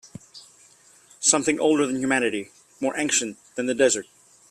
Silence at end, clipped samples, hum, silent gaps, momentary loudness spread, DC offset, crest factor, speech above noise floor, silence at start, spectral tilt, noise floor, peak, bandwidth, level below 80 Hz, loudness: 0.45 s; under 0.1%; none; none; 13 LU; under 0.1%; 22 dB; 32 dB; 0.35 s; -2 dB/octave; -54 dBFS; -4 dBFS; 14.5 kHz; -66 dBFS; -23 LUFS